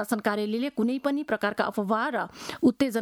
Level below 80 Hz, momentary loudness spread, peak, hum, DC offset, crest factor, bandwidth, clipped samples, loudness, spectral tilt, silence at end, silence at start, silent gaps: -66 dBFS; 5 LU; -10 dBFS; none; under 0.1%; 16 dB; 18.5 kHz; under 0.1%; -27 LUFS; -5 dB/octave; 0 s; 0 s; none